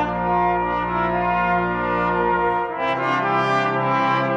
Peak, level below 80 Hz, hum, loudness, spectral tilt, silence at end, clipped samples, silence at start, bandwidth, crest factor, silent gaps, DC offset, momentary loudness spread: -8 dBFS; -42 dBFS; none; -20 LUFS; -7 dB/octave; 0 s; under 0.1%; 0 s; 8.8 kHz; 12 dB; none; under 0.1%; 3 LU